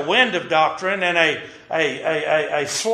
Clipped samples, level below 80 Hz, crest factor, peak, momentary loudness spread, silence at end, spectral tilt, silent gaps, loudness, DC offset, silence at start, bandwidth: under 0.1%; -62 dBFS; 18 dB; -2 dBFS; 5 LU; 0 s; -2.5 dB/octave; none; -19 LUFS; under 0.1%; 0 s; 13 kHz